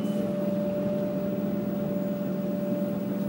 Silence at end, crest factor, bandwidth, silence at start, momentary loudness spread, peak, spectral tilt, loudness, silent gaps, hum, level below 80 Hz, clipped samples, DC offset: 0 s; 12 dB; 16 kHz; 0 s; 1 LU; -16 dBFS; -8.5 dB/octave; -29 LUFS; none; none; -60 dBFS; under 0.1%; under 0.1%